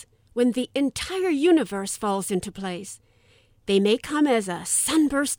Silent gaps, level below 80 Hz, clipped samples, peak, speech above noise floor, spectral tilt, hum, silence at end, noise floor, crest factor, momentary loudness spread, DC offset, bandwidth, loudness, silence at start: none; -54 dBFS; under 0.1%; -10 dBFS; 36 dB; -3.5 dB/octave; none; 0.05 s; -59 dBFS; 14 dB; 13 LU; under 0.1%; over 20 kHz; -23 LUFS; 0.35 s